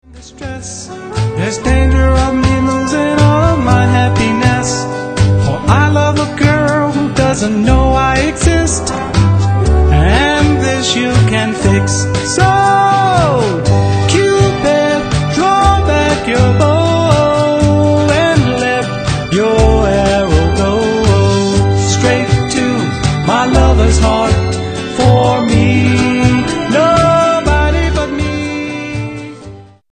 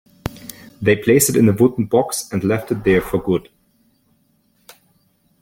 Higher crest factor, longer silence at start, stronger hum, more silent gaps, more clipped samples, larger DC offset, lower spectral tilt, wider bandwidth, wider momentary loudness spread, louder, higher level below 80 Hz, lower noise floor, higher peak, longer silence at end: second, 10 dB vs 18 dB; second, 0.1 s vs 0.25 s; neither; neither; first, 0.1% vs under 0.1%; neither; about the same, -5.5 dB/octave vs -5.5 dB/octave; second, 9.4 kHz vs 17 kHz; second, 7 LU vs 17 LU; first, -11 LUFS vs -17 LUFS; first, -20 dBFS vs -46 dBFS; second, -33 dBFS vs -61 dBFS; about the same, 0 dBFS vs 0 dBFS; second, 0.3 s vs 2 s